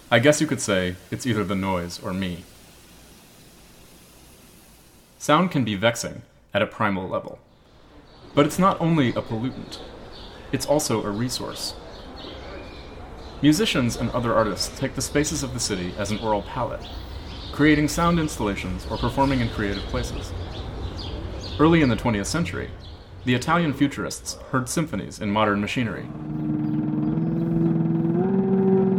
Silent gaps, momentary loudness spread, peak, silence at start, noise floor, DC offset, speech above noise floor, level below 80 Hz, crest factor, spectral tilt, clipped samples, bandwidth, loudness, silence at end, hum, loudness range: none; 17 LU; -2 dBFS; 0.05 s; -51 dBFS; under 0.1%; 28 dB; -42 dBFS; 22 dB; -5 dB/octave; under 0.1%; 17 kHz; -24 LUFS; 0 s; none; 5 LU